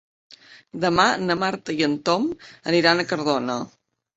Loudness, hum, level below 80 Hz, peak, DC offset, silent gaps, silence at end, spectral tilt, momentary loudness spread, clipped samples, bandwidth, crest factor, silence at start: -22 LUFS; none; -58 dBFS; -2 dBFS; under 0.1%; none; 0.5 s; -4.5 dB/octave; 12 LU; under 0.1%; 8 kHz; 22 dB; 0.3 s